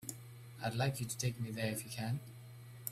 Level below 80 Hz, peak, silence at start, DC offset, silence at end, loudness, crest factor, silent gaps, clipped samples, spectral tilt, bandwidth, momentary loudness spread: -70 dBFS; -18 dBFS; 0 s; under 0.1%; 0 s; -40 LUFS; 22 dB; none; under 0.1%; -4.5 dB/octave; 16 kHz; 17 LU